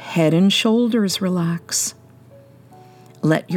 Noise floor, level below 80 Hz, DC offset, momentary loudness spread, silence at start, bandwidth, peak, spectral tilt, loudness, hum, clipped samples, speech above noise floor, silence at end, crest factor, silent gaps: -46 dBFS; -70 dBFS; under 0.1%; 7 LU; 0 s; 17.5 kHz; -4 dBFS; -4.5 dB/octave; -18 LUFS; none; under 0.1%; 28 dB; 0 s; 16 dB; none